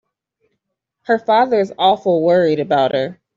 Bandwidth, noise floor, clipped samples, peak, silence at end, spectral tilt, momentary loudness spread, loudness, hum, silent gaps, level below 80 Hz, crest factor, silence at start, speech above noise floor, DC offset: 7.6 kHz; -75 dBFS; under 0.1%; -2 dBFS; 0.25 s; -7 dB/octave; 6 LU; -16 LUFS; none; none; -64 dBFS; 14 dB; 1.1 s; 60 dB; under 0.1%